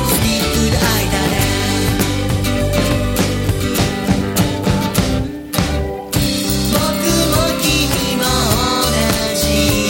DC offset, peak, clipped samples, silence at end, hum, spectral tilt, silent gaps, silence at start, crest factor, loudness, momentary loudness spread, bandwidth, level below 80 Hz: under 0.1%; 0 dBFS; under 0.1%; 0 s; none; -4 dB/octave; none; 0 s; 16 dB; -16 LUFS; 4 LU; 17 kHz; -26 dBFS